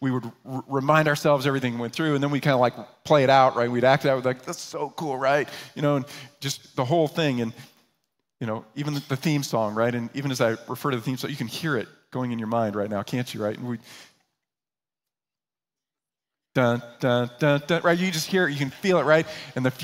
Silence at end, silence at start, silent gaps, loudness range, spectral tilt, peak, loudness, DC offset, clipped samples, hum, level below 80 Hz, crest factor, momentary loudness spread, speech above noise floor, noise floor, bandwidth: 0 s; 0 s; none; 9 LU; -5.5 dB/octave; -4 dBFS; -24 LUFS; under 0.1%; under 0.1%; none; -68 dBFS; 20 dB; 12 LU; over 66 dB; under -90 dBFS; 16 kHz